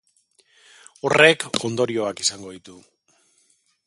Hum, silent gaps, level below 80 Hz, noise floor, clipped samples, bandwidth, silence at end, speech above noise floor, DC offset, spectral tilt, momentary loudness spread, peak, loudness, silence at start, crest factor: none; none; -64 dBFS; -64 dBFS; under 0.1%; 11.5 kHz; 1.15 s; 43 dB; under 0.1%; -3 dB/octave; 24 LU; 0 dBFS; -19 LUFS; 1.05 s; 24 dB